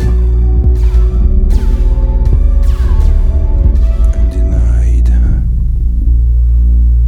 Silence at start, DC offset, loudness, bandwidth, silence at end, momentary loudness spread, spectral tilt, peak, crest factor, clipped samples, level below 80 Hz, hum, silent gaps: 0 s; under 0.1%; -12 LUFS; 2.6 kHz; 0 s; 3 LU; -9 dB/octave; 0 dBFS; 8 dB; under 0.1%; -8 dBFS; none; none